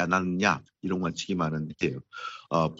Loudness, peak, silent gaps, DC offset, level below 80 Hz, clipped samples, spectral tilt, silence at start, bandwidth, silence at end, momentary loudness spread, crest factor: -29 LUFS; -8 dBFS; none; under 0.1%; -58 dBFS; under 0.1%; -5.5 dB/octave; 0 s; 8 kHz; 0 s; 11 LU; 22 dB